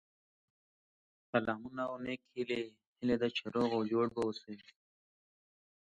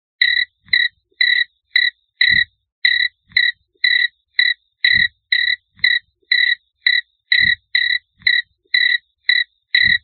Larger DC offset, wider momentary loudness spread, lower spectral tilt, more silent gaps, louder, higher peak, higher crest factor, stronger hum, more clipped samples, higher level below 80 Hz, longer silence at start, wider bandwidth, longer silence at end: neither; first, 11 LU vs 5 LU; first, -6.5 dB/octave vs -2 dB/octave; about the same, 2.87-2.96 s vs 2.72-2.82 s; second, -36 LUFS vs -15 LUFS; second, -14 dBFS vs 0 dBFS; first, 24 dB vs 18 dB; neither; neither; second, -72 dBFS vs -54 dBFS; first, 1.35 s vs 0.2 s; first, 9 kHz vs 4.5 kHz; first, 1.4 s vs 0.05 s